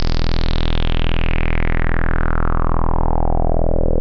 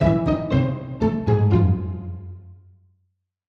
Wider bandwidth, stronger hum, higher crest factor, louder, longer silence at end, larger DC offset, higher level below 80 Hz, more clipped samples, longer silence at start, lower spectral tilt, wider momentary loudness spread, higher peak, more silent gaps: second, 5.6 kHz vs 6.2 kHz; neither; second, 8 dB vs 18 dB; about the same, -21 LUFS vs -21 LUFS; second, 0 s vs 0.95 s; neither; first, -16 dBFS vs -38 dBFS; neither; about the same, 0 s vs 0 s; second, -7.5 dB/octave vs -10 dB/octave; second, 1 LU vs 18 LU; about the same, -6 dBFS vs -4 dBFS; neither